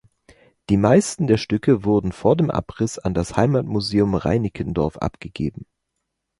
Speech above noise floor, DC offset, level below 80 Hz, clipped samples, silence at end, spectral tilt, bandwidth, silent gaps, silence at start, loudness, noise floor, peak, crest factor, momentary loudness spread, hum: 58 dB; under 0.1%; -42 dBFS; under 0.1%; 0.75 s; -6.5 dB/octave; 11.5 kHz; none; 0.7 s; -21 LUFS; -78 dBFS; -2 dBFS; 18 dB; 11 LU; none